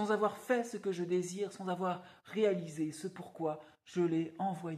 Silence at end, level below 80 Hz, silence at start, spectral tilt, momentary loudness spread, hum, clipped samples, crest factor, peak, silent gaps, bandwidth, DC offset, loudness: 0 s; -82 dBFS; 0 s; -6 dB/octave; 10 LU; none; under 0.1%; 16 dB; -20 dBFS; none; 14.5 kHz; under 0.1%; -36 LUFS